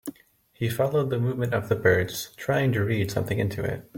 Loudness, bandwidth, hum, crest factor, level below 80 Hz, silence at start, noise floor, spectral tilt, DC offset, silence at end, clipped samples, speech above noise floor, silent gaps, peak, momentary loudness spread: -26 LUFS; 17 kHz; none; 20 dB; -54 dBFS; 0.05 s; -58 dBFS; -6 dB/octave; under 0.1%; 0 s; under 0.1%; 33 dB; none; -6 dBFS; 9 LU